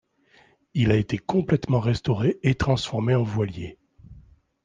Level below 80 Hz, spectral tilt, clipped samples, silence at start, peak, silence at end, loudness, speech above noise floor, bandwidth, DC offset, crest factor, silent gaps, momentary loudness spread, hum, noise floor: -46 dBFS; -7.5 dB/octave; under 0.1%; 0.75 s; -6 dBFS; 0.45 s; -24 LUFS; 36 dB; 9.2 kHz; under 0.1%; 18 dB; none; 8 LU; none; -59 dBFS